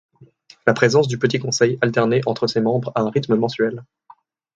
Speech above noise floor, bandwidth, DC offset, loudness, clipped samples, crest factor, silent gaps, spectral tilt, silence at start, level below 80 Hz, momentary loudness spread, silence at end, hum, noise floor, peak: 31 dB; 9 kHz; under 0.1%; -19 LUFS; under 0.1%; 20 dB; none; -5.5 dB/octave; 0.2 s; -60 dBFS; 6 LU; 0.7 s; none; -49 dBFS; 0 dBFS